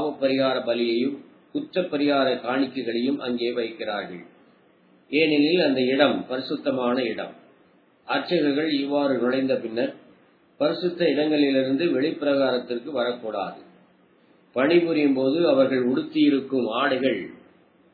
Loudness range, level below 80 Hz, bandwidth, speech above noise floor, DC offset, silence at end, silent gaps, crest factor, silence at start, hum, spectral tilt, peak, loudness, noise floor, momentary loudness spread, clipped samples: 4 LU; -76 dBFS; 4.9 kHz; 36 dB; under 0.1%; 0.6 s; none; 20 dB; 0 s; none; -8.5 dB/octave; -4 dBFS; -23 LUFS; -59 dBFS; 10 LU; under 0.1%